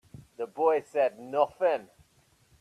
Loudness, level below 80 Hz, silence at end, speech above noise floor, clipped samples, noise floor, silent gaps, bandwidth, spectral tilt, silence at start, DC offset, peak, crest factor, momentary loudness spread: -29 LUFS; -70 dBFS; 0.75 s; 38 dB; under 0.1%; -65 dBFS; none; 12.5 kHz; -5.5 dB/octave; 0.15 s; under 0.1%; -10 dBFS; 20 dB; 10 LU